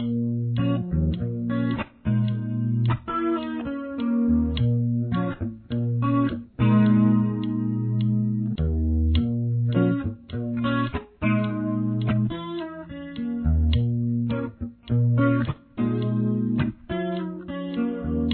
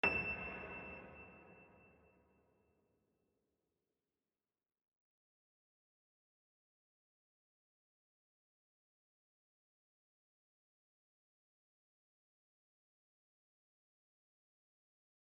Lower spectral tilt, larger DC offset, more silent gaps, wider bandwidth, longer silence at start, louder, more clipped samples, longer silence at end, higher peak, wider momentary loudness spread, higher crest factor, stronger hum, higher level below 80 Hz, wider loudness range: first, -12 dB/octave vs -2.5 dB/octave; neither; neither; second, 4.3 kHz vs 6 kHz; about the same, 0 s vs 0.05 s; first, -25 LUFS vs -43 LUFS; neither; second, 0 s vs 13.4 s; first, -8 dBFS vs -22 dBFS; second, 9 LU vs 24 LU; second, 16 dB vs 32 dB; neither; first, -36 dBFS vs -72 dBFS; second, 3 LU vs 21 LU